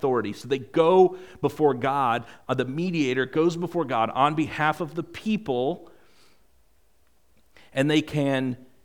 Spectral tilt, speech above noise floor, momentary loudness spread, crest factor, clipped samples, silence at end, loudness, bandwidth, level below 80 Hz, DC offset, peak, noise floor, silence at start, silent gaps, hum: -6.5 dB/octave; 42 dB; 9 LU; 20 dB; under 0.1%; 0.3 s; -25 LUFS; 16.5 kHz; -62 dBFS; 0.2%; -6 dBFS; -66 dBFS; 0 s; none; none